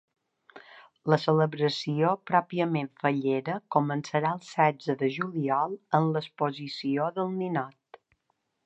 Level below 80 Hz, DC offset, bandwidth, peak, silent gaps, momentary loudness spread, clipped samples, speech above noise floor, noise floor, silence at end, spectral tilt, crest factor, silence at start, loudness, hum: -78 dBFS; under 0.1%; 8.2 kHz; -8 dBFS; none; 6 LU; under 0.1%; 50 dB; -77 dBFS; 0.95 s; -7 dB/octave; 22 dB; 0.55 s; -28 LUFS; none